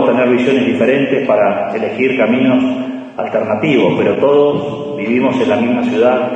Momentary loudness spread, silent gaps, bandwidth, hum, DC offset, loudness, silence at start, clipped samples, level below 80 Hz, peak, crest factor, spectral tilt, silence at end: 7 LU; none; 8.2 kHz; none; under 0.1%; -13 LUFS; 0 s; under 0.1%; -60 dBFS; 0 dBFS; 12 dB; -7 dB/octave; 0 s